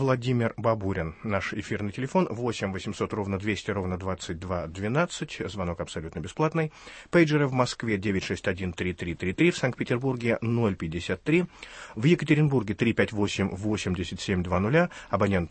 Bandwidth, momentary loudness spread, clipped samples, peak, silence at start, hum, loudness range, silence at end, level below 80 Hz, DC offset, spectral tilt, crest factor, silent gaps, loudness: 8.8 kHz; 9 LU; under 0.1%; -8 dBFS; 0 s; none; 5 LU; 0 s; -52 dBFS; under 0.1%; -6.5 dB/octave; 20 dB; none; -27 LUFS